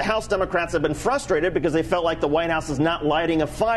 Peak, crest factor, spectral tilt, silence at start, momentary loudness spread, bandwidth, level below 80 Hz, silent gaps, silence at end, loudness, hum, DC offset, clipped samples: -8 dBFS; 14 dB; -5.5 dB/octave; 0 s; 2 LU; 12.5 kHz; -40 dBFS; none; 0 s; -22 LUFS; none; under 0.1%; under 0.1%